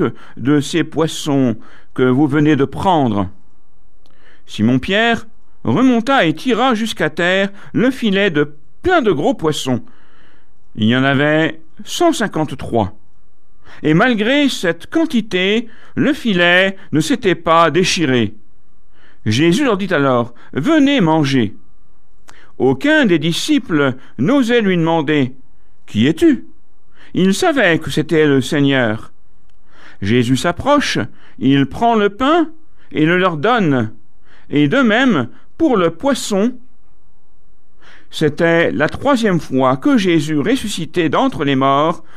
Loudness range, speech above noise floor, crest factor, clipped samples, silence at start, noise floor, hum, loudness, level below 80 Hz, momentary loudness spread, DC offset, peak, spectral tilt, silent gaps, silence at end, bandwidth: 3 LU; 41 dB; 14 dB; under 0.1%; 0 s; -55 dBFS; none; -15 LUFS; -46 dBFS; 9 LU; 4%; -2 dBFS; -5.5 dB/octave; none; 0.15 s; 14.5 kHz